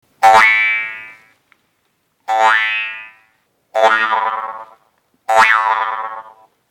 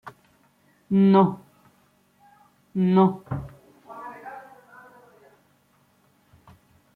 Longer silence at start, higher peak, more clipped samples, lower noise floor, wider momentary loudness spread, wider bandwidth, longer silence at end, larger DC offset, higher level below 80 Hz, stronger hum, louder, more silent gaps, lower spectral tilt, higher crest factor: first, 0.2 s vs 0.05 s; first, 0 dBFS vs -6 dBFS; first, 0.2% vs under 0.1%; about the same, -65 dBFS vs -63 dBFS; second, 22 LU vs 26 LU; first, 18.5 kHz vs 4.4 kHz; second, 0.4 s vs 2.55 s; neither; about the same, -60 dBFS vs -60 dBFS; neither; first, -13 LUFS vs -21 LUFS; neither; second, -0.5 dB/octave vs -10 dB/octave; about the same, 16 dB vs 20 dB